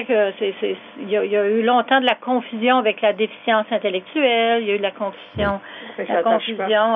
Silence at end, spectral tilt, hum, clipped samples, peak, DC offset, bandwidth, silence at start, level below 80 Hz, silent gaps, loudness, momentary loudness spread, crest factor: 0 s; -7.5 dB/octave; none; under 0.1%; -4 dBFS; under 0.1%; 4.3 kHz; 0 s; -52 dBFS; none; -20 LUFS; 9 LU; 16 dB